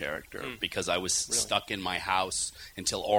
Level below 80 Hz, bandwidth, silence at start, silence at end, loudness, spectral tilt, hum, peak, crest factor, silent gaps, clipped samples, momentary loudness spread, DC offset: -56 dBFS; over 20 kHz; 0 s; 0 s; -30 LUFS; -1.5 dB/octave; none; -10 dBFS; 20 dB; none; under 0.1%; 8 LU; under 0.1%